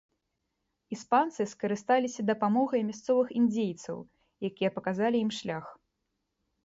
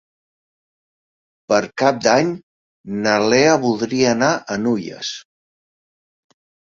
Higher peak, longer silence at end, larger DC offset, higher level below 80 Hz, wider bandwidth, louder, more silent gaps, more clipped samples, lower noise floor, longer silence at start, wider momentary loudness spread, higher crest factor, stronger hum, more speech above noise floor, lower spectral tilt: second, -12 dBFS vs 0 dBFS; second, 0.9 s vs 1.45 s; neither; second, -72 dBFS vs -60 dBFS; about the same, 8 kHz vs 7.6 kHz; second, -29 LUFS vs -18 LUFS; second, none vs 2.43-2.84 s; neither; second, -82 dBFS vs under -90 dBFS; second, 0.9 s vs 1.5 s; about the same, 13 LU vs 14 LU; about the same, 18 dB vs 20 dB; neither; second, 53 dB vs over 73 dB; first, -5.5 dB/octave vs -4 dB/octave